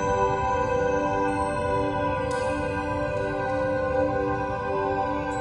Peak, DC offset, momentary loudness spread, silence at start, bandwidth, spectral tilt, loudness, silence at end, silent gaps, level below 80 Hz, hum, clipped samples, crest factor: -12 dBFS; under 0.1%; 3 LU; 0 s; 11 kHz; -6.5 dB/octave; -26 LUFS; 0 s; none; -42 dBFS; none; under 0.1%; 12 dB